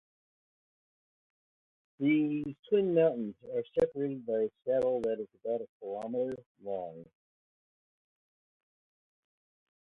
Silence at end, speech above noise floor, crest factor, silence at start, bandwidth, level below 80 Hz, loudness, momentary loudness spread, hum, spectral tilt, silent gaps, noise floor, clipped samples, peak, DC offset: 2.95 s; over 58 dB; 20 dB; 2 s; 4.8 kHz; -72 dBFS; -32 LUFS; 11 LU; none; -8.5 dB/octave; 2.59-2.63 s, 5.69-5.80 s, 6.46-6.55 s; under -90 dBFS; under 0.1%; -16 dBFS; under 0.1%